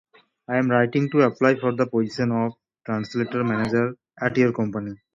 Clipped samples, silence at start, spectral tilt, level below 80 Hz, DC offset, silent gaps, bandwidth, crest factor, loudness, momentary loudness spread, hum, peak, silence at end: under 0.1%; 0.5 s; -7.5 dB/octave; -60 dBFS; under 0.1%; none; 7.6 kHz; 18 dB; -23 LUFS; 9 LU; none; -4 dBFS; 0.2 s